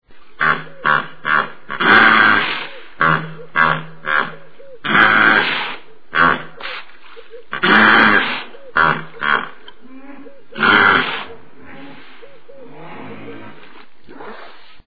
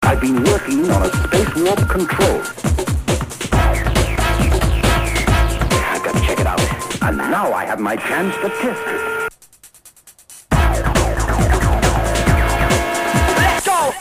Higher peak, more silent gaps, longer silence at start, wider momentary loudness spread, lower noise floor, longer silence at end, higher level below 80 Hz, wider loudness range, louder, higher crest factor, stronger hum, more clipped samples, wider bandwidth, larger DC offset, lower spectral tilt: about the same, 0 dBFS vs -2 dBFS; neither; about the same, 0 s vs 0 s; first, 24 LU vs 5 LU; about the same, -44 dBFS vs -46 dBFS; about the same, 0 s vs 0 s; second, -52 dBFS vs -22 dBFS; about the same, 4 LU vs 4 LU; first, -14 LUFS vs -17 LUFS; about the same, 18 dB vs 16 dB; neither; neither; second, 5.4 kHz vs 15.5 kHz; first, 2% vs under 0.1%; first, -6.5 dB/octave vs -5 dB/octave